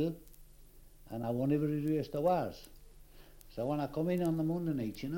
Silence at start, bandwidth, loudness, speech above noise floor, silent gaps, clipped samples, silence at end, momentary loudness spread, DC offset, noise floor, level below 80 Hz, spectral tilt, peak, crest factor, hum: 0 s; 17 kHz; -34 LUFS; 23 dB; none; under 0.1%; 0 s; 12 LU; under 0.1%; -56 dBFS; -56 dBFS; -8 dB/octave; -20 dBFS; 16 dB; 50 Hz at -55 dBFS